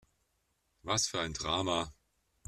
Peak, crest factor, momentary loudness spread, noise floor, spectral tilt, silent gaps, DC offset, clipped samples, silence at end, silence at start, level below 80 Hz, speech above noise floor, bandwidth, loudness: -16 dBFS; 22 dB; 10 LU; -78 dBFS; -2.5 dB/octave; none; under 0.1%; under 0.1%; 0.55 s; 0.85 s; -58 dBFS; 44 dB; 14 kHz; -33 LUFS